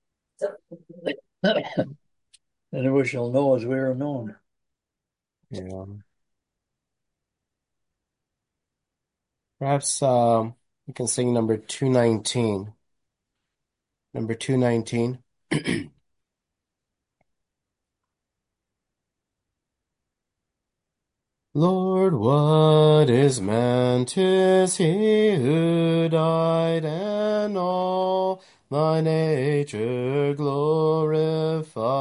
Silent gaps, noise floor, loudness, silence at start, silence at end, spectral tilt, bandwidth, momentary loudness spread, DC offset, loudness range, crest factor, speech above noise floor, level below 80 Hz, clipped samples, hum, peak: none; -87 dBFS; -22 LUFS; 0.4 s; 0 s; -6 dB/octave; 11 kHz; 14 LU; under 0.1%; 15 LU; 20 dB; 65 dB; -62 dBFS; under 0.1%; none; -4 dBFS